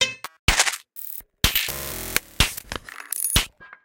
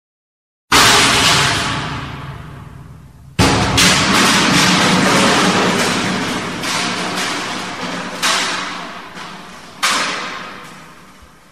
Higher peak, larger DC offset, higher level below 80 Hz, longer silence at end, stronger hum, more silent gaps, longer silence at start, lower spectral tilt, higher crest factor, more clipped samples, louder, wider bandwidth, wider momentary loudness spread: about the same, 0 dBFS vs 0 dBFS; second, under 0.1% vs 0.5%; about the same, -34 dBFS vs -38 dBFS; about the same, 0.2 s vs 0.25 s; neither; first, 0.39-0.48 s vs none; second, 0 s vs 0.7 s; about the same, -1.5 dB/octave vs -2.5 dB/octave; first, 26 dB vs 16 dB; neither; second, -23 LUFS vs -13 LUFS; about the same, 17.5 kHz vs 16 kHz; second, 13 LU vs 20 LU